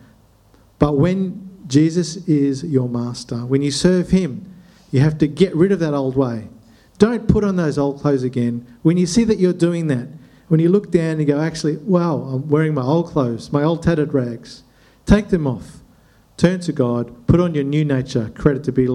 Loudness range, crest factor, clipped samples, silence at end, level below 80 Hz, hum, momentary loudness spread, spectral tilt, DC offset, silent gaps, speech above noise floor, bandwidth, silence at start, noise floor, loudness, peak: 2 LU; 18 dB; under 0.1%; 0 s; -38 dBFS; none; 8 LU; -7 dB/octave; under 0.1%; none; 34 dB; 11 kHz; 0.8 s; -52 dBFS; -18 LUFS; 0 dBFS